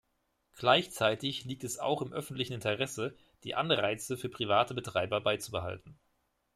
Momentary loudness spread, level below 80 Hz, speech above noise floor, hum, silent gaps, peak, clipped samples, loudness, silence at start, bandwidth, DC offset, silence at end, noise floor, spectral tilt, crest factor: 11 LU; -68 dBFS; 45 dB; none; none; -10 dBFS; under 0.1%; -32 LUFS; 0.55 s; 15 kHz; under 0.1%; 0.65 s; -78 dBFS; -4 dB/octave; 24 dB